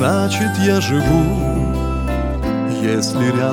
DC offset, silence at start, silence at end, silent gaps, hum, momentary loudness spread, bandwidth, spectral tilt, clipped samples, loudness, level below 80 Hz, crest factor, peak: under 0.1%; 0 s; 0 s; none; none; 5 LU; 17 kHz; -6 dB/octave; under 0.1%; -17 LUFS; -26 dBFS; 14 dB; -2 dBFS